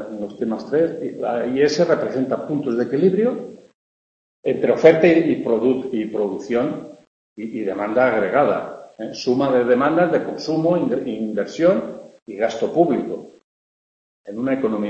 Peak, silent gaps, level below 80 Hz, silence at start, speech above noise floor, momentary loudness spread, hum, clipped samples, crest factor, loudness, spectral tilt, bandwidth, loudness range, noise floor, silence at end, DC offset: 0 dBFS; 3.74-4.43 s, 7.07-7.36 s, 12.22-12.26 s, 13.44-14.24 s; -62 dBFS; 0 s; over 71 dB; 14 LU; none; under 0.1%; 20 dB; -19 LUFS; -6.5 dB/octave; 8.2 kHz; 4 LU; under -90 dBFS; 0 s; under 0.1%